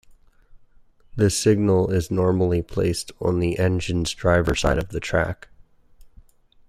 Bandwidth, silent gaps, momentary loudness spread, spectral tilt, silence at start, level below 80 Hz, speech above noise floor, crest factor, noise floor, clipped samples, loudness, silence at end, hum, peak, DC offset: 14 kHz; none; 6 LU; -5.5 dB/octave; 1.15 s; -38 dBFS; 31 dB; 18 dB; -52 dBFS; under 0.1%; -22 LUFS; 0.6 s; none; -6 dBFS; under 0.1%